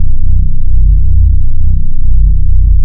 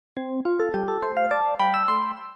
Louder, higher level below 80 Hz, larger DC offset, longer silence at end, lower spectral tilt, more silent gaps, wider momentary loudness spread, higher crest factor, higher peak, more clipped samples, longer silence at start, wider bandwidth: first, -13 LUFS vs -24 LUFS; first, -6 dBFS vs -64 dBFS; neither; about the same, 0 s vs 0 s; first, -15.5 dB/octave vs -6.5 dB/octave; neither; about the same, 4 LU vs 5 LU; second, 4 dB vs 12 dB; first, 0 dBFS vs -12 dBFS; neither; second, 0 s vs 0.15 s; second, 0.4 kHz vs 8.8 kHz